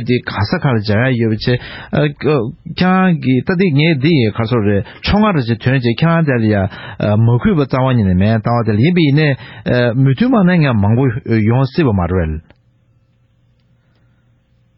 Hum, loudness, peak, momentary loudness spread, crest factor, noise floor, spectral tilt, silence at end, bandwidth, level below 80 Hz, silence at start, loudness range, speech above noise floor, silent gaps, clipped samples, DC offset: none; -14 LUFS; 0 dBFS; 6 LU; 14 dB; -55 dBFS; -12 dB/octave; 2.4 s; 5.8 kHz; -36 dBFS; 0 s; 3 LU; 42 dB; none; under 0.1%; under 0.1%